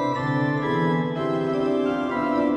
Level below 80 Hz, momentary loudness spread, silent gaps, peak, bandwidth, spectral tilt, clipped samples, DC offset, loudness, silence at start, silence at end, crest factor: -56 dBFS; 2 LU; none; -12 dBFS; 9.4 kHz; -8 dB/octave; under 0.1%; under 0.1%; -24 LUFS; 0 s; 0 s; 12 dB